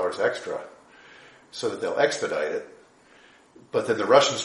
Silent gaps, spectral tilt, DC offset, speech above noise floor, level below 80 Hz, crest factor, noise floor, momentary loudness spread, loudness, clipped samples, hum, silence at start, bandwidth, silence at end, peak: none; -3 dB/octave; under 0.1%; 30 dB; -72 dBFS; 22 dB; -55 dBFS; 18 LU; -25 LUFS; under 0.1%; none; 0 s; 11.5 kHz; 0 s; -4 dBFS